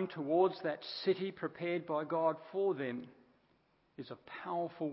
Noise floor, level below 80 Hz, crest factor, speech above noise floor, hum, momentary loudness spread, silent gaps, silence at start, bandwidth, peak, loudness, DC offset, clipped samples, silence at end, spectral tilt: -73 dBFS; -84 dBFS; 20 dB; 37 dB; none; 16 LU; none; 0 s; 5.6 kHz; -18 dBFS; -36 LUFS; under 0.1%; under 0.1%; 0 s; -4.5 dB/octave